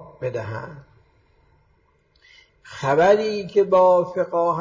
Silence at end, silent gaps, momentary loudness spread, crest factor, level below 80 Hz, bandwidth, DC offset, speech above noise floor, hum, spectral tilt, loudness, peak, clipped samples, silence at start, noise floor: 0 s; none; 18 LU; 16 dB; -60 dBFS; 7.6 kHz; under 0.1%; 43 dB; none; -6.5 dB/octave; -19 LUFS; -6 dBFS; under 0.1%; 0 s; -62 dBFS